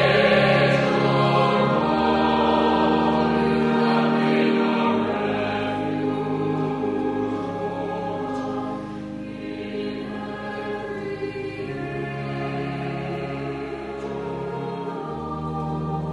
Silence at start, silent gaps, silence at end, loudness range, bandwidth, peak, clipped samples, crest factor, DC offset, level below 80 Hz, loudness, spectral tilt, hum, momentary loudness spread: 0 s; none; 0 s; 10 LU; 11 kHz; -6 dBFS; under 0.1%; 18 dB; under 0.1%; -48 dBFS; -23 LUFS; -7 dB/octave; none; 12 LU